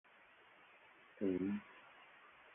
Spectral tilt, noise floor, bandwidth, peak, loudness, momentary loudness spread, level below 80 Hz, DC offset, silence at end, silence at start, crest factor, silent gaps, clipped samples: -6 dB/octave; -66 dBFS; 3.7 kHz; -28 dBFS; -42 LUFS; 24 LU; -78 dBFS; under 0.1%; 0.05 s; 1.15 s; 20 dB; none; under 0.1%